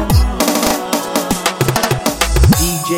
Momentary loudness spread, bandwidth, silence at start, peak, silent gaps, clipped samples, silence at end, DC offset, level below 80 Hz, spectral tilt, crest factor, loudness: 5 LU; 17 kHz; 0 s; 0 dBFS; none; under 0.1%; 0 s; under 0.1%; -20 dBFS; -4.5 dB/octave; 14 dB; -14 LUFS